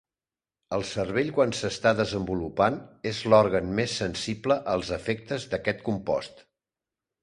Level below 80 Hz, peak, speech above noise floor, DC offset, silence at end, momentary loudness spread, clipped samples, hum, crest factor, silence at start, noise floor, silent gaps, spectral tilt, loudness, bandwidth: -52 dBFS; -6 dBFS; over 64 dB; under 0.1%; 0.8 s; 10 LU; under 0.1%; none; 22 dB; 0.7 s; under -90 dBFS; none; -5 dB/octave; -27 LUFS; 11 kHz